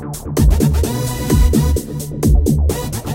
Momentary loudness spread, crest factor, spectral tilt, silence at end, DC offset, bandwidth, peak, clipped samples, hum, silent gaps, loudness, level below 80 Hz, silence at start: 8 LU; 12 dB; -6.5 dB/octave; 0 s; under 0.1%; 17 kHz; -2 dBFS; under 0.1%; none; none; -16 LUFS; -18 dBFS; 0 s